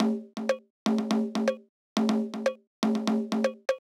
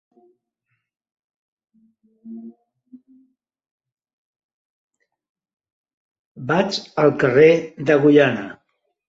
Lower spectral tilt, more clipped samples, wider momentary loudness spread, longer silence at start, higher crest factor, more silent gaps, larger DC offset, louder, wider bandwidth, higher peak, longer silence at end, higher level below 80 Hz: about the same, -5.5 dB/octave vs -6.5 dB/octave; neither; second, 5 LU vs 25 LU; second, 0 s vs 2.25 s; about the same, 20 dB vs 20 dB; second, 0.70-0.86 s, 1.69-1.96 s, 2.67-2.82 s vs 3.71-3.78 s, 3.92-3.97 s, 4.13-4.34 s, 4.44-4.88 s, 5.29-5.35 s, 5.72-5.84 s, 5.94-6.35 s; neither; second, -29 LUFS vs -17 LUFS; first, 12 kHz vs 7.8 kHz; second, -8 dBFS vs -2 dBFS; second, 0.15 s vs 0.55 s; second, under -90 dBFS vs -64 dBFS